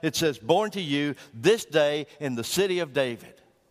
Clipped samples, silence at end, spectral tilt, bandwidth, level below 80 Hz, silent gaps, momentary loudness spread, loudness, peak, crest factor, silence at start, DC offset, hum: under 0.1%; 0.4 s; -4 dB/octave; 15.5 kHz; -64 dBFS; none; 8 LU; -26 LUFS; -8 dBFS; 18 dB; 0.05 s; under 0.1%; none